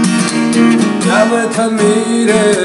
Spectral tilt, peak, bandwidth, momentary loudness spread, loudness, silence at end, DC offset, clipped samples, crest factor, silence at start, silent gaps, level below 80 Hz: -4.5 dB/octave; 0 dBFS; 12 kHz; 3 LU; -11 LUFS; 0 s; under 0.1%; under 0.1%; 10 dB; 0 s; none; -54 dBFS